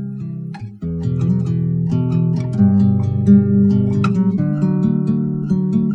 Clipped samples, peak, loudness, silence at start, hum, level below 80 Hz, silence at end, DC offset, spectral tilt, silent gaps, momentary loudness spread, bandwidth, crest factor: under 0.1%; 0 dBFS; -16 LUFS; 0 s; none; -44 dBFS; 0 s; under 0.1%; -10.5 dB/octave; none; 13 LU; 6 kHz; 14 dB